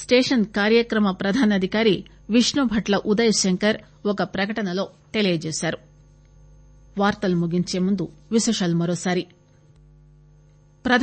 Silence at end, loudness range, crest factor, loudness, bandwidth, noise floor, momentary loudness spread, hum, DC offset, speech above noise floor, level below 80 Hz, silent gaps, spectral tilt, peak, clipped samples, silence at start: 0 s; 6 LU; 18 dB; -22 LUFS; 8.8 kHz; -53 dBFS; 9 LU; none; under 0.1%; 32 dB; -52 dBFS; none; -4.5 dB/octave; -4 dBFS; under 0.1%; 0 s